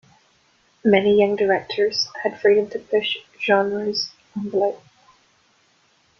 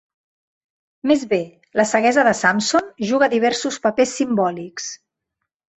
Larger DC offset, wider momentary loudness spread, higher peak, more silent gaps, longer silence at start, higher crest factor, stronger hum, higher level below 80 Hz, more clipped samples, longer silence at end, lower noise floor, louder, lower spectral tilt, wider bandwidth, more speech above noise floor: neither; second, 8 LU vs 13 LU; about the same, -2 dBFS vs -2 dBFS; neither; second, 0.85 s vs 1.05 s; about the same, 20 dB vs 18 dB; neither; about the same, -62 dBFS vs -62 dBFS; neither; first, 1.4 s vs 0.85 s; second, -61 dBFS vs -80 dBFS; second, -21 LUFS vs -18 LUFS; about the same, -4.5 dB/octave vs -3.5 dB/octave; second, 6.8 kHz vs 8.4 kHz; second, 41 dB vs 61 dB